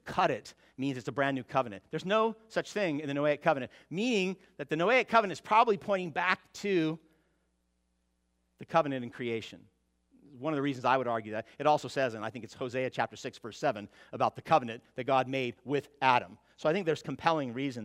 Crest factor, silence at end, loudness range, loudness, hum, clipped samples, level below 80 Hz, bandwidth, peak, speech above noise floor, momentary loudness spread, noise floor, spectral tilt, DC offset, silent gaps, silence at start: 24 dB; 0 s; 6 LU; -31 LUFS; none; under 0.1%; -72 dBFS; 13.5 kHz; -8 dBFS; 45 dB; 12 LU; -77 dBFS; -5.5 dB/octave; under 0.1%; none; 0.05 s